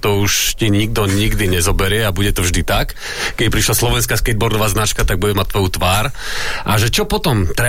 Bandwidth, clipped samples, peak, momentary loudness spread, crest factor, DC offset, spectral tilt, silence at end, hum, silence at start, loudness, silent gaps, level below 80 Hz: 16.5 kHz; under 0.1%; -2 dBFS; 4 LU; 12 dB; under 0.1%; -4 dB/octave; 0 s; none; 0 s; -16 LUFS; none; -24 dBFS